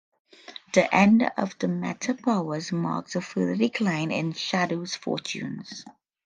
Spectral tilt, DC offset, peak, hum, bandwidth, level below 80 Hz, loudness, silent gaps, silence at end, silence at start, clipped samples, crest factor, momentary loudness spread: -5.5 dB/octave; under 0.1%; -4 dBFS; none; 9.6 kHz; -68 dBFS; -26 LUFS; none; 0.35 s; 0.5 s; under 0.1%; 22 dB; 15 LU